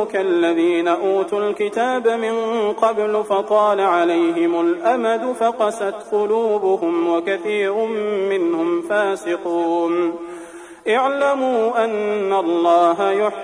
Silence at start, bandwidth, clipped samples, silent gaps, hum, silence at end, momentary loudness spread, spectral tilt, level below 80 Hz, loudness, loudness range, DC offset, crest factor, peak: 0 s; 10.5 kHz; under 0.1%; none; none; 0 s; 5 LU; -5 dB/octave; -66 dBFS; -19 LUFS; 2 LU; under 0.1%; 14 dB; -4 dBFS